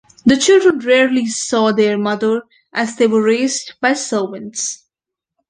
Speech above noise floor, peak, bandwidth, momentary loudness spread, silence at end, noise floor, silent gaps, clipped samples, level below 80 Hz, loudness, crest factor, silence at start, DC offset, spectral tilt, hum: 69 dB; -2 dBFS; 10 kHz; 11 LU; 0.75 s; -84 dBFS; none; under 0.1%; -56 dBFS; -15 LUFS; 14 dB; 0.25 s; under 0.1%; -3.5 dB/octave; none